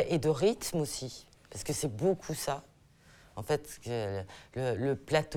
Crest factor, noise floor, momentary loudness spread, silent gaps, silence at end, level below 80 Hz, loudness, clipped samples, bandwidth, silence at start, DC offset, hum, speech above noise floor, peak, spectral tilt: 20 dB; -60 dBFS; 14 LU; none; 0 s; -58 dBFS; -33 LUFS; under 0.1%; 19.5 kHz; 0 s; under 0.1%; none; 28 dB; -12 dBFS; -5 dB/octave